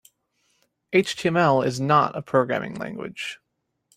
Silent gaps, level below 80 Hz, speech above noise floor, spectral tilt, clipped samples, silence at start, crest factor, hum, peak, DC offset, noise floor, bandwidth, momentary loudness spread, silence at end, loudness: none; -64 dBFS; 47 dB; -5.5 dB/octave; under 0.1%; 0.9 s; 20 dB; none; -4 dBFS; under 0.1%; -70 dBFS; 15.5 kHz; 13 LU; 0.6 s; -23 LUFS